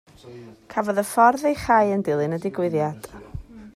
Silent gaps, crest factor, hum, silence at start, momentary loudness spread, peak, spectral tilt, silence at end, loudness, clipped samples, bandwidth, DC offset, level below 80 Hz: none; 18 dB; none; 0.25 s; 22 LU; -4 dBFS; -6 dB/octave; 0.05 s; -21 LUFS; under 0.1%; 15.5 kHz; under 0.1%; -50 dBFS